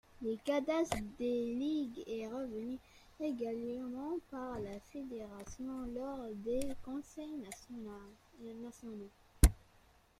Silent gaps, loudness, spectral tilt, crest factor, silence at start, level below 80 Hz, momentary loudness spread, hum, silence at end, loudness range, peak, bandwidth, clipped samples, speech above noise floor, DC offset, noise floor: none; -40 LUFS; -6 dB/octave; 30 dB; 0.15 s; -44 dBFS; 15 LU; none; 0.6 s; 6 LU; -10 dBFS; 15 kHz; under 0.1%; 26 dB; under 0.1%; -67 dBFS